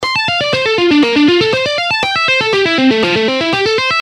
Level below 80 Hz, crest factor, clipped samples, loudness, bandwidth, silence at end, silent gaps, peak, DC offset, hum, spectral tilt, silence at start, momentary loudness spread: -48 dBFS; 12 dB; under 0.1%; -11 LUFS; 11.5 kHz; 0 s; none; 0 dBFS; under 0.1%; none; -4 dB/octave; 0 s; 3 LU